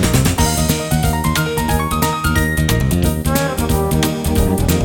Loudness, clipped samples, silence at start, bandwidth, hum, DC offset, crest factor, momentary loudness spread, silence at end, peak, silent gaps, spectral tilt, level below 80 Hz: -16 LUFS; under 0.1%; 0 s; 19.5 kHz; none; under 0.1%; 16 dB; 2 LU; 0 s; 0 dBFS; none; -5 dB/octave; -24 dBFS